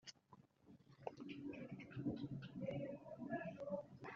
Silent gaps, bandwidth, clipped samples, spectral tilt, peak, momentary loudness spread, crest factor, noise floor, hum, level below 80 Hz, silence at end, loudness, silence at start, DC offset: none; 7.4 kHz; under 0.1%; -6.5 dB/octave; -30 dBFS; 20 LU; 22 dB; -70 dBFS; none; -78 dBFS; 0 s; -50 LUFS; 0.05 s; under 0.1%